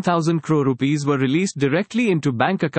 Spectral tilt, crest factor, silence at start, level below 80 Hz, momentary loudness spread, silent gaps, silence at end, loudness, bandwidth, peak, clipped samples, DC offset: -6.5 dB/octave; 16 dB; 0 s; -64 dBFS; 1 LU; none; 0 s; -20 LUFS; 8.8 kHz; -4 dBFS; under 0.1%; under 0.1%